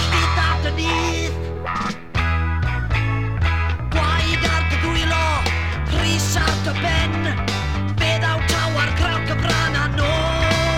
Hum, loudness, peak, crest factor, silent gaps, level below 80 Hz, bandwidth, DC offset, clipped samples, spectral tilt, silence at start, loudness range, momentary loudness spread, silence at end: none; -20 LUFS; -4 dBFS; 16 dB; none; -26 dBFS; 16 kHz; 1%; under 0.1%; -4.5 dB/octave; 0 s; 2 LU; 4 LU; 0 s